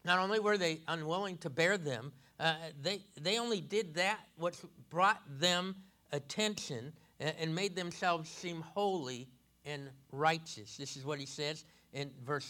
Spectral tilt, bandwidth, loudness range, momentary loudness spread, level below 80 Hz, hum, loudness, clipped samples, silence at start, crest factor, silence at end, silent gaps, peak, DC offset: -3.5 dB/octave; 18.5 kHz; 4 LU; 14 LU; -78 dBFS; none; -36 LUFS; under 0.1%; 0.05 s; 20 dB; 0 s; none; -16 dBFS; under 0.1%